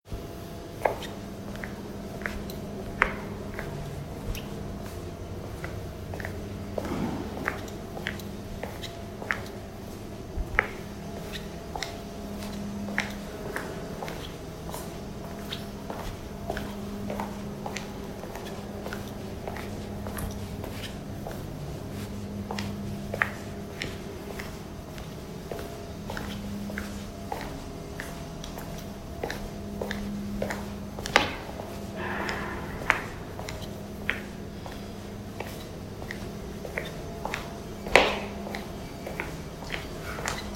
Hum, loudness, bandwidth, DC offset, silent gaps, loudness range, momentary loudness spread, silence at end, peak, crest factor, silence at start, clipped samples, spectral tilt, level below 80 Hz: none; -34 LUFS; 16 kHz; under 0.1%; none; 8 LU; 11 LU; 0 s; 0 dBFS; 34 dB; 0.05 s; under 0.1%; -4.5 dB/octave; -44 dBFS